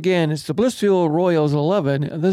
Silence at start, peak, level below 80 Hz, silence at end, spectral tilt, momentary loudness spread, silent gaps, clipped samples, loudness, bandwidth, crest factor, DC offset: 0 s; -8 dBFS; -58 dBFS; 0 s; -7 dB/octave; 4 LU; none; under 0.1%; -19 LUFS; 14 kHz; 10 dB; under 0.1%